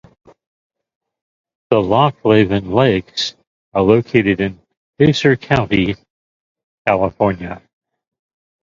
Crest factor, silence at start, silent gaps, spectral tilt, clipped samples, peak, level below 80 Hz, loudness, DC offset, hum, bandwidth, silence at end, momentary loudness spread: 18 dB; 1.7 s; 3.47-3.72 s, 4.77-4.93 s, 6.10-6.55 s, 6.63-6.85 s; -6.5 dB/octave; under 0.1%; 0 dBFS; -44 dBFS; -16 LUFS; under 0.1%; none; 7.6 kHz; 1.05 s; 10 LU